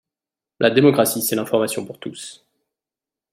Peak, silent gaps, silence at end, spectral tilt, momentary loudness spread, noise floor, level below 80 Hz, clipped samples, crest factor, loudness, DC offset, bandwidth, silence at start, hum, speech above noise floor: -2 dBFS; none; 1 s; -4.5 dB/octave; 18 LU; -89 dBFS; -64 dBFS; under 0.1%; 20 dB; -18 LUFS; under 0.1%; 16.5 kHz; 0.6 s; none; 71 dB